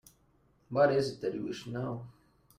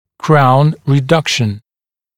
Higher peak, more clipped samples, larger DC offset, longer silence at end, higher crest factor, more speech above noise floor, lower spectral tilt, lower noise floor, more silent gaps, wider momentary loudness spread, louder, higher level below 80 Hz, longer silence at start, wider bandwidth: second, -14 dBFS vs 0 dBFS; neither; neither; about the same, 0.5 s vs 0.6 s; first, 20 dB vs 14 dB; second, 37 dB vs over 79 dB; about the same, -6.5 dB/octave vs -6 dB/octave; second, -68 dBFS vs under -90 dBFS; neither; first, 14 LU vs 9 LU; second, -32 LUFS vs -12 LUFS; second, -68 dBFS vs -50 dBFS; first, 0.7 s vs 0.25 s; first, 15 kHz vs 13 kHz